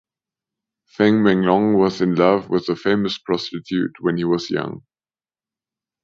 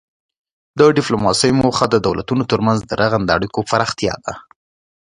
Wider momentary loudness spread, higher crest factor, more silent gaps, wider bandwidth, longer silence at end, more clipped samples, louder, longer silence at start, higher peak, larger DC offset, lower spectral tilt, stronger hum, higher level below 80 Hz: about the same, 9 LU vs 9 LU; about the same, 18 dB vs 18 dB; neither; second, 7.4 kHz vs 11 kHz; first, 1.25 s vs 0.65 s; neither; second, -19 LUFS vs -16 LUFS; first, 1 s vs 0.75 s; about the same, -2 dBFS vs 0 dBFS; neither; first, -7 dB/octave vs -5 dB/octave; neither; second, -56 dBFS vs -44 dBFS